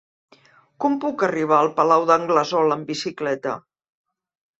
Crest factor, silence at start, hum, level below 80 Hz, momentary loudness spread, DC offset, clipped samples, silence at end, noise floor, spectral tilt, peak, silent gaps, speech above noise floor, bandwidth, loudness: 20 dB; 0.8 s; none; -68 dBFS; 10 LU; under 0.1%; under 0.1%; 1 s; -55 dBFS; -5 dB/octave; -2 dBFS; none; 35 dB; 8 kHz; -20 LUFS